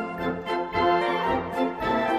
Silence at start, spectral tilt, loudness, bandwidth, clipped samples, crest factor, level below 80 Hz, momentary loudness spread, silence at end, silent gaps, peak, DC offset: 0 s; -6 dB/octave; -25 LUFS; 14 kHz; under 0.1%; 14 dB; -50 dBFS; 7 LU; 0 s; none; -10 dBFS; under 0.1%